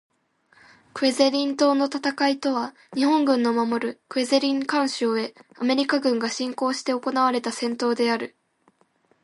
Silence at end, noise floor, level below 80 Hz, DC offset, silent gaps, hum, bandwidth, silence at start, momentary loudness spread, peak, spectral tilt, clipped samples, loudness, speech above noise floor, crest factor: 0.95 s; -64 dBFS; -78 dBFS; under 0.1%; none; none; 11.5 kHz; 0.95 s; 8 LU; -6 dBFS; -3 dB/octave; under 0.1%; -23 LUFS; 41 dB; 18 dB